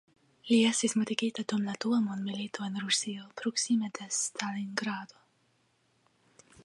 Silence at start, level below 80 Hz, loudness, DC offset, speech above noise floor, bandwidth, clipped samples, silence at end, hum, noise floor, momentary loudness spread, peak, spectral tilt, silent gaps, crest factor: 0.45 s; -80 dBFS; -31 LUFS; under 0.1%; 41 dB; 11.5 kHz; under 0.1%; 1.6 s; none; -72 dBFS; 10 LU; -12 dBFS; -3 dB/octave; none; 20 dB